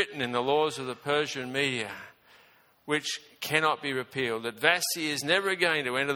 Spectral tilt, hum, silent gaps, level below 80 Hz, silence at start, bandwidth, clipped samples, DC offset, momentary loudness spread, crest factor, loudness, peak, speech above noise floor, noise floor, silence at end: -3 dB/octave; none; none; -72 dBFS; 0 s; 18.5 kHz; under 0.1%; under 0.1%; 10 LU; 24 dB; -28 LUFS; -6 dBFS; 32 dB; -61 dBFS; 0 s